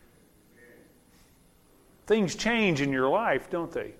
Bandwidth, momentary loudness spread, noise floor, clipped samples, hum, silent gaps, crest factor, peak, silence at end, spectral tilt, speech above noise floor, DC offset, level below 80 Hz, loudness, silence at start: 15.5 kHz; 6 LU; -60 dBFS; under 0.1%; none; none; 18 dB; -12 dBFS; 0.05 s; -5 dB/octave; 33 dB; under 0.1%; -56 dBFS; -26 LUFS; 2.05 s